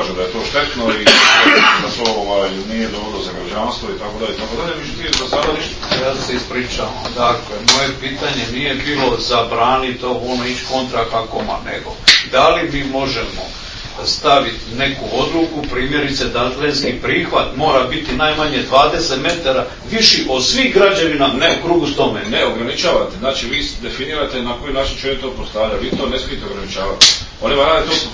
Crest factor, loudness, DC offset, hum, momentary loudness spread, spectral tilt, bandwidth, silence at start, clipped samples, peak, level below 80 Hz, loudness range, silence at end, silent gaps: 16 dB; -15 LUFS; under 0.1%; none; 12 LU; -3 dB/octave; 8 kHz; 0 s; 0.1%; 0 dBFS; -34 dBFS; 6 LU; 0 s; none